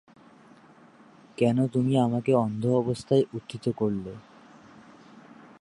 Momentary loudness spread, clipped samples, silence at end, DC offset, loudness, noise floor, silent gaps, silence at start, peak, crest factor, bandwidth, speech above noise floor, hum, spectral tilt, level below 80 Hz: 11 LU; under 0.1%; 0.4 s; under 0.1%; -26 LUFS; -54 dBFS; none; 1.4 s; -10 dBFS; 18 dB; 11.5 kHz; 29 dB; none; -8 dB/octave; -64 dBFS